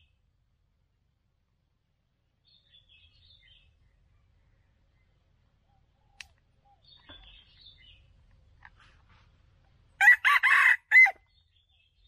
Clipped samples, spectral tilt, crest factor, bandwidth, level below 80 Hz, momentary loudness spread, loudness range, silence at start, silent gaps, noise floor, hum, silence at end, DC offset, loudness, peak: under 0.1%; 1 dB/octave; 22 dB; 15 kHz; -66 dBFS; 3 LU; 5 LU; 10 s; none; -75 dBFS; none; 0.95 s; under 0.1%; -19 LUFS; -8 dBFS